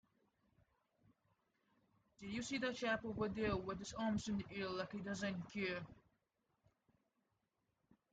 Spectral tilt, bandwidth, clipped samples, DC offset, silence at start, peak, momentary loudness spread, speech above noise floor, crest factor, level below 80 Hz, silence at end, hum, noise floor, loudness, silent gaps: -5 dB/octave; 9 kHz; under 0.1%; under 0.1%; 2.2 s; -26 dBFS; 7 LU; 43 dB; 20 dB; -68 dBFS; 2.15 s; none; -86 dBFS; -43 LUFS; none